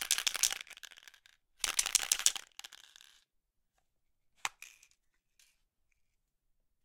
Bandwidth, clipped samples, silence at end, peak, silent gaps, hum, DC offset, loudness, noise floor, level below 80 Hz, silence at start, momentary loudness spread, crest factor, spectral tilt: 18 kHz; under 0.1%; 2.15 s; -2 dBFS; none; none; under 0.1%; -32 LUFS; -80 dBFS; -70 dBFS; 0 s; 23 LU; 38 dB; 4 dB/octave